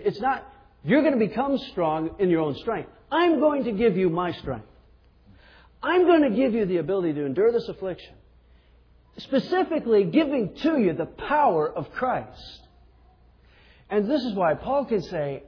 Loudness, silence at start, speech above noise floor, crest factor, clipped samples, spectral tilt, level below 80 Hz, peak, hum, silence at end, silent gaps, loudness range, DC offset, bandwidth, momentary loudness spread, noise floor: -24 LUFS; 0 s; 33 dB; 16 dB; under 0.1%; -8 dB/octave; -54 dBFS; -8 dBFS; none; 0.05 s; none; 4 LU; under 0.1%; 5.4 kHz; 12 LU; -56 dBFS